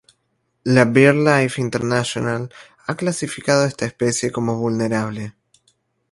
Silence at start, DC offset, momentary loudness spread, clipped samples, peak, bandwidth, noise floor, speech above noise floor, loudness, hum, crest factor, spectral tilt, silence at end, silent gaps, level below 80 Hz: 0.65 s; under 0.1%; 16 LU; under 0.1%; 0 dBFS; 11.5 kHz; -69 dBFS; 51 dB; -19 LUFS; none; 20 dB; -5.5 dB/octave; 0.8 s; none; -56 dBFS